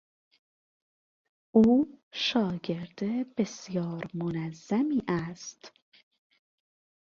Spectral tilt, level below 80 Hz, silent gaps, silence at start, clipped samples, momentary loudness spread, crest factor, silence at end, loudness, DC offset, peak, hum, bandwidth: -6 dB/octave; -64 dBFS; 2.03-2.11 s; 1.55 s; under 0.1%; 13 LU; 20 dB; 1.4 s; -29 LUFS; under 0.1%; -10 dBFS; none; 7.4 kHz